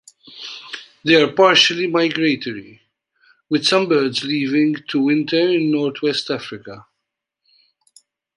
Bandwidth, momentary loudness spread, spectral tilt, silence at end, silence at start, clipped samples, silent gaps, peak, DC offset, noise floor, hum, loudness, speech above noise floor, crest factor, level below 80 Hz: 11.5 kHz; 20 LU; -4 dB/octave; 1.55 s; 0.25 s; under 0.1%; none; -2 dBFS; under 0.1%; -80 dBFS; none; -17 LUFS; 62 dB; 18 dB; -66 dBFS